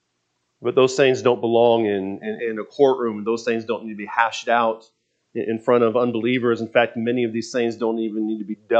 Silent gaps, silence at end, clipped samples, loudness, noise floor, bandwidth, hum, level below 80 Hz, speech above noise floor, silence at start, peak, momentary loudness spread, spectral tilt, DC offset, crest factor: none; 0 s; under 0.1%; -21 LUFS; -73 dBFS; 8.4 kHz; none; -76 dBFS; 52 dB; 0.6 s; -2 dBFS; 10 LU; -5.5 dB/octave; under 0.1%; 20 dB